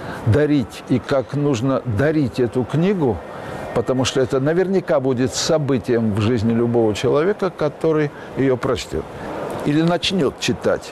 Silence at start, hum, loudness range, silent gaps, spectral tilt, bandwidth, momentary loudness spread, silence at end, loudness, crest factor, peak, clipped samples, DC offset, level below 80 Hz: 0 s; none; 2 LU; none; -6 dB/octave; 13.5 kHz; 6 LU; 0 s; -19 LUFS; 12 dB; -8 dBFS; under 0.1%; under 0.1%; -46 dBFS